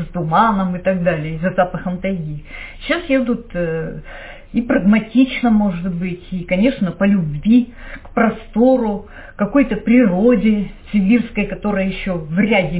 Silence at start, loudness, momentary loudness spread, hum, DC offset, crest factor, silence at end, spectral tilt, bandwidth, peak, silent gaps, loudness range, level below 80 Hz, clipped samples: 0 s; -17 LUFS; 12 LU; none; under 0.1%; 14 dB; 0 s; -11 dB/octave; 4 kHz; -2 dBFS; none; 4 LU; -38 dBFS; under 0.1%